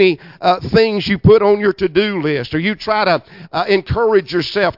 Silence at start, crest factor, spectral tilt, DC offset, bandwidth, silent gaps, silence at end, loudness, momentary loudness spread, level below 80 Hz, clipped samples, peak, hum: 0 s; 14 dB; -7.5 dB/octave; under 0.1%; 5.8 kHz; none; 0.05 s; -15 LUFS; 8 LU; -42 dBFS; under 0.1%; 0 dBFS; none